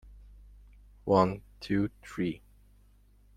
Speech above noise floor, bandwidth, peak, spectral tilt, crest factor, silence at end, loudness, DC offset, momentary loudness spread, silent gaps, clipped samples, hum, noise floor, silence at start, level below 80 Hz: 32 dB; 12 kHz; -8 dBFS; -7.5 dB/octave; 24 dB; 1 s; -31 LUFS; under 0.1%; 17 LU; none; under 0.1%; 50 Hz at -50 dBFS; -60 dBFS; 0.05 s; -54 dBFS